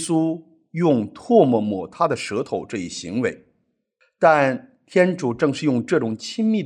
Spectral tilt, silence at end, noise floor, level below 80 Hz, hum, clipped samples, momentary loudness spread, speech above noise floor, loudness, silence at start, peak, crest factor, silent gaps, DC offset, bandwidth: -6 dB/octave; 0 s; -70 dBFS; -66 dBFS; none; under 0.1%; 11 LU; 50 dB; -21 LUFS; 0 s; -2 dBFS; 18 dB; none; under 0.1%; 11 kHz